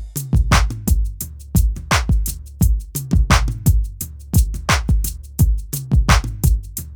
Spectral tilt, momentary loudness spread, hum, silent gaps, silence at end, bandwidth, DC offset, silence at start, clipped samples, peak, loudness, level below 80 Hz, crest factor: -4.5 dB/octave; 8 LU; none; none; 0 s; over 20 kHz; under 0.1%; 0 s; under 0.1%; 0 dBFS; -19 LUFS; -20 dBFS; 18 dB